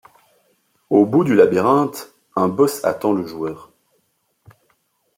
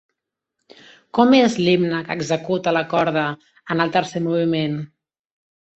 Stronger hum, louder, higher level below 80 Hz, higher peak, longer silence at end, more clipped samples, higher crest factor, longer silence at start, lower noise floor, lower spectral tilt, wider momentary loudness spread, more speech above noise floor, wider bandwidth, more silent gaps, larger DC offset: neither; about the same, -18 LUFS vs -19 LUFS; about the same, -64 dBFS vs -62 dBFS; about the same, -2 dBFS vs -2 dBFS; first, 1.55 s vs 0.9 s; neither; about the same, 18 dB vs 20 dB; second, 0.9 s vs 1.15 s; second, -67 dBFS vs -80 dBFS; about the same, -6.5 dB/octave vs -6 dB/octave; first, 14 LU vs 11 LU; second, 50 dB vs 61 dB; first, 16.5 kHz vs 8.2 kHz; neither; neither